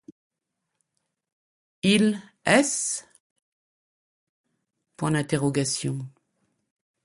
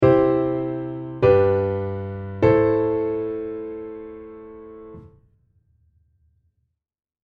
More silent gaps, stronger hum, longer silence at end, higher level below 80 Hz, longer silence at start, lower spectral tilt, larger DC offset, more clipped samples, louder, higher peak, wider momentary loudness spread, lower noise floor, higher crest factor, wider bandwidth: first, 3.20-3.36 s, 3.42-4.44 s vs none; neither; second, 0.95 s vs 2.2 s; second, -62 dBFS vs -48 dBFS; first, 1.85 s vs 0 s; second, -4 dB/octave vs -10 dB/octave; neither; neither; second, -24 LUFS vs -21 LUFS; second, -6 dBFS vs -2 dBFS; second, 12 LU vs 24 LU; first, -82 dBFS vs -74 dBFS; about the same, 22 dB vs 20 dB; first, 11.5 kHz vs 5.2 kHz